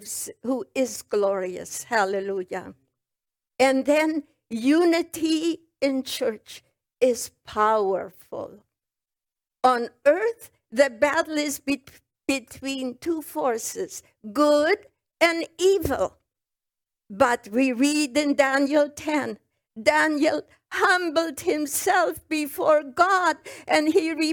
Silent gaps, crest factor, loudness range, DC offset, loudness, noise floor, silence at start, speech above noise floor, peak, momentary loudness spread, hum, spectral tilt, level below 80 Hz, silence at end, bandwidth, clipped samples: none; 20 dB; 4 LU; under 0.1%; -24 LUFS; -89 dBFS; 0 s; 66 dB; -4 dBFS; 12 LU; none; -3 dB/octave; -60 dBFS; 0 s; 19.5 kHz; under 0.1%